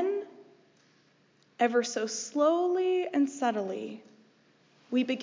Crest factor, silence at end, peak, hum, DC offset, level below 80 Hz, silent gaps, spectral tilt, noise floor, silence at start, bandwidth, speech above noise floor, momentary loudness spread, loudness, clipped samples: 18 dB; 0 s; -12 dBFS; none; under 0.1%; under -90 dBFS; none; -3.5 dB/octave; -65 dBFS; 0 s; 7.6 kHz; 37 dB; 12 LU; -29 LUFS; under 0.1%